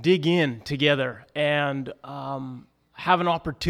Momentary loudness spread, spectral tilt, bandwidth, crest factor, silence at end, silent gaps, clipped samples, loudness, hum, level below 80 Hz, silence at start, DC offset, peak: 14 LU; -6 dB/octave; 14 kHz; 20 dB; 0 s; none; under 0.1%; -24 LUFS; none; -56 dBFS; 0 s; under 0.1%; -4 dBFS